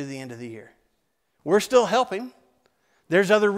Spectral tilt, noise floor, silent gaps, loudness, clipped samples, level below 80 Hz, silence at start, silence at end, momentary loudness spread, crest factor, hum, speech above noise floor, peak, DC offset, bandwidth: -4.5 dB/octave; -73 dBFS; none; -22 LUFS; under 0.1%; -66 dBFS; 0 s; 0 s; 20 LU; 18 dB; none; 51 dB; -6 dBFS; under 0.1%; 16 kHz